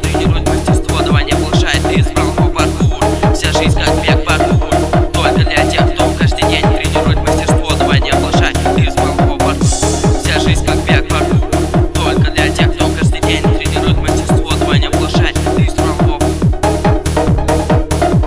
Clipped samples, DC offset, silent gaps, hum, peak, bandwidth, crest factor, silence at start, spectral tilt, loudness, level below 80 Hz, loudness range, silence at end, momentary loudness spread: under 0.1%; under 0.1%; none; none; 0 dBFS; 11 kHz; 12 dB; 0 s; -5.5 dB/octave; -12 LUFS; -18 dBFS; 1 LU; 0 s; 2 LU